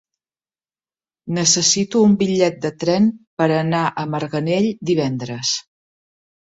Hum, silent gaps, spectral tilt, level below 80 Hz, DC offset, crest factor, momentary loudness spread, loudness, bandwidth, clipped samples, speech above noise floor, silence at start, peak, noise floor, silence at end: none; 3.27-3.37 s; -4 dB/octave; -60 dBFS; under 0.1%; 18 dB; 9 LU; -18 LUFS; 8 kHz; under 0.1%; over 72 dB; 1.25 s; -2 dBFS; under -90 dBFS; 0.95 s